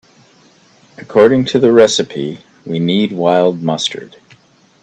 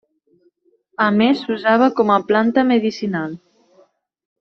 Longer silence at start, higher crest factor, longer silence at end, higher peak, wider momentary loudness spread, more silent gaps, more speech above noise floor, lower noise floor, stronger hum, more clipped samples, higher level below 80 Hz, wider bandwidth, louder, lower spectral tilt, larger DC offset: about the same, 1 s vs 1 s; about the same, 14 dB vs 18 dB; second, 0.75 s vs 1.05 s; about the same, 0 dBFS vs -2 dBFS; about the same, 14 LU vs 12 LU; neither; second, 36 dB vs 45 dB; second, -48 dBFS vs -61 dBFS; neither; neither; first, -56 dBFS vs -62 dBFS; first, 9 kHz vs 6.4 kHz; first, -13 LUFS vs -17 LUFS; second, -5 dB/octave vs -6.5 dB/octave; neither